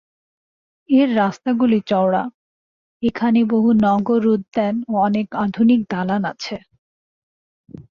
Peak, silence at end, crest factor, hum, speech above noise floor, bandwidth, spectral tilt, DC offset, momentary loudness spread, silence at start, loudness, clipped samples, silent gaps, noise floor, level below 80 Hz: -6 dBFS; 0.1 s; 14 dB; none; over 73 dB; 7 kHz; -7.5 dB/octave; under 0.1%; 8 LU; 0.9 s; -18 LUFS; under 0.1%; 2.34-3.00 s, 6.78-7.64 s; under -90 dBFS; -58 dBFS